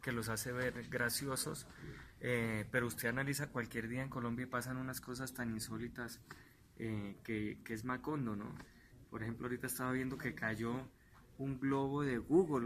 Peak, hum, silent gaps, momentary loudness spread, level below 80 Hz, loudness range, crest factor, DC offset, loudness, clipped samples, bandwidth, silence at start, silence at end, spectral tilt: -20 dBFS; none; none; 12 LU; -64 dBFS; 5 LU; 20 dB; under 0.1%; -40 LUFS; under 0.1%; 14.5 kHz; 0 s; 0 s; -5 dB/octave